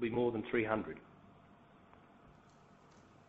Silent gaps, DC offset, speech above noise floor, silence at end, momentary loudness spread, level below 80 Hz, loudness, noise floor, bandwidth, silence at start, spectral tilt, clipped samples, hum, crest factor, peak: none; under 0.1%; 27 dB; 1 s; 18 LU; -68 dBFS; -37 LUFS; -63 dBFS; 6.6 kHz; 0 s; -5.5 dB/octave; under 0.1%; none; 24 dB; -18 dBFS